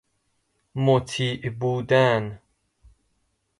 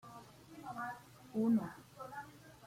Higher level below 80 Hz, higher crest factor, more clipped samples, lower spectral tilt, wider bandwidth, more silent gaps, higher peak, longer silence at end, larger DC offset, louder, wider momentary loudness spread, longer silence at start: first, -56 dBFS vs -76 dBFS; about the same, 18 dB vs 16 dB; neither; about the same, -6 dB/octave vs -7 dB/octave; second, 11.5 kHz vs 16 kHz; neither; first, -6 dBFS vs -24 dBFS; first, 1.25 s vs 0 s; neither; first, -23 LUFS vs -40 LUFS; second, 10 LU vs 21 LU; first, 0.75 s vs 0.05 s